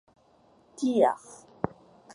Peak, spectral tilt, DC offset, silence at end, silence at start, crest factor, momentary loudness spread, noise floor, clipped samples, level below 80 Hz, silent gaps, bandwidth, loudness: -8 dBFS; -6 dB/octave; under 0.1%; 0.45 s; 0.8 s; 22 dB; 15 LU; -62 dBFS; under 0.1%; -64 dBFS; none; 11.5 kHz; -28 LUFS